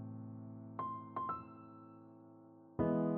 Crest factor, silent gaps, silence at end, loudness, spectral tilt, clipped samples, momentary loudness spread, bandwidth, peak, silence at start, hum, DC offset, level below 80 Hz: 20 dB; none; 0 s; -43 LUFS; -9.5 dB/octave; under 0.1%; 21 LU; 4.2 kHz; -22 dBFS; 0 s; none; under 0.1%; -68 dBFS